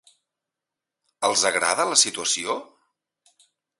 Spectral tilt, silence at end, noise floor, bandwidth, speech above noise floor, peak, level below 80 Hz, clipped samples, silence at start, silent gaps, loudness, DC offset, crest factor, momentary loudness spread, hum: 0.5 dB/octave; 1.15 s; -87 dBFS; 12 kHz; 64 dB; -2 dBFS; -70 dBFS; under 0.1%; 1.2 s; none; -21 LUFS; under 0.1%; 24 dB; 9 LU; none